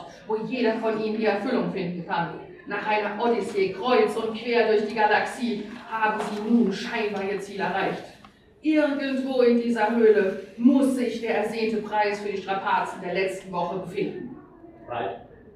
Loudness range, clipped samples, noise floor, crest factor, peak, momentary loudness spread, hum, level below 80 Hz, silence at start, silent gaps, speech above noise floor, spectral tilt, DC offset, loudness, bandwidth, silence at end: 5 LU; under 0.1%; -52 dBFS; 18 dB; -8 dBFS; 11 LU; none; -64 dBFS; 0 s; none; 28 dB; -6 dB/octave; under 0.1%; -25 LUFS; 12.5 kHz; 0.05 s